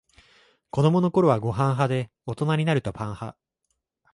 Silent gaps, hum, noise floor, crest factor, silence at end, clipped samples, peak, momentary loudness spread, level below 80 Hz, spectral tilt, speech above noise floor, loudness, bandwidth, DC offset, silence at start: none; none; -78 dBFS; 18 dB; 0.8 s; under 0.1%; -6 dBFS; 13 LU; -56 dBFS; -8 dB/octave; 55 dB; -24 LUFS; 11.5 kHz; under 0.1%; 0.75 s